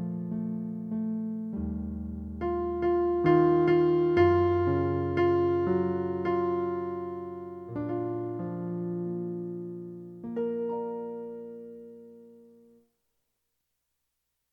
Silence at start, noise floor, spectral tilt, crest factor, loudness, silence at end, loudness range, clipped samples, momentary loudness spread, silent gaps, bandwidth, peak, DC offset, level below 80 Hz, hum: 0 s; -81 dBFS; -10 dB/octave; 18 dB; -29 LUFS; 2.15 s; 13 LU; under 0.1%; 17 LU; none; 5.4 kHz; -10 dBFS; under 0.1%; -52 dBFS; none